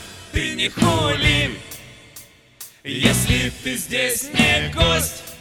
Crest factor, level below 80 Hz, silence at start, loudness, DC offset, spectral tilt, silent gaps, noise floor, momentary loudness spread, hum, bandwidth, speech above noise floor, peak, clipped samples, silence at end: 20 dB; -34 dBFS; 0 s; -19 LUFS; under 0.1%; -3.5 dB/octave; none; -45 dBFS; 19 LU; none; 18 kHz; 25 dB; -2 dBFS; under 0.1%; 0 s